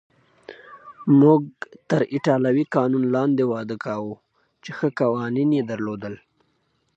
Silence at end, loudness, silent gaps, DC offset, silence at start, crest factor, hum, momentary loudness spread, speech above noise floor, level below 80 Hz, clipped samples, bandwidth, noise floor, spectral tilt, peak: 0.8 s; -21 LUFS; none; under 0.1%; 0.5 s; 20 dB; none; 21 LU; 48 dB; -68 dBFS; under 0.1%; 7.8 kHz; -68 dBFS; -8.5 dB/octave; -2 dBFS